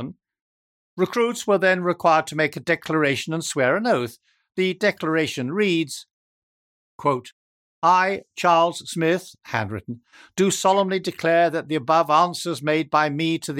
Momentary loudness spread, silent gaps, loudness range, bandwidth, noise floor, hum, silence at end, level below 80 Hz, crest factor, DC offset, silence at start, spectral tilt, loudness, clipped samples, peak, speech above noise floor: 10 LU; 0.41-0.97 s, 6.13-6.99 s, 7.32-7.82 s; 4 LU; 17 kHz; under -90 dBFS; none; 0 s; -68 dBFS; 18 dB; under 0.1%; 0 s; -4.5 dB/octave; -21 LUFS; under 0.1%; -4 dBFS; over 69 dB